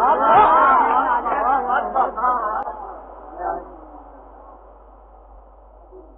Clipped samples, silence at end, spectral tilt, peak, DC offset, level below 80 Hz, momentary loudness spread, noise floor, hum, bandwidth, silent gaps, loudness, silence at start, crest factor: under 0.1%; 0.15 s; -8 dB/octave; -2 dBFS; under 0.1%; -46 dBFS; 22 LU; -46 dBFS; none; 4 kHz; none; -17 LUFS; 0 s; 18 dB